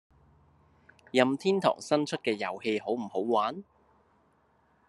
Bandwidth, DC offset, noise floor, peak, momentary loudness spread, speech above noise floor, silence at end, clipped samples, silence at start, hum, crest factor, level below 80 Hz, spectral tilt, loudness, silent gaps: 12 kHz; under 0.1%; -67 dBFS; -8 dBFS; 6 LU; 39 dB; 1.25 s; under 0.1%; 1.15 s; none; 24 dB; -74 dBFS; -5 dB/octave; -29 LUFS; none